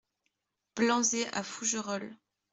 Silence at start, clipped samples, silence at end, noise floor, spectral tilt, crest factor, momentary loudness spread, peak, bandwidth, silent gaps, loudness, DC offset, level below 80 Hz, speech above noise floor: 0.75 s; under 0.1%; 0.35 s; -82 dBFS; -2 dB/octave; 20 dB; 14 LU; -14 dBFS; 8.2 kHz; none; -31 LUFS; under 0.1%; -78 dBFS; 50 dB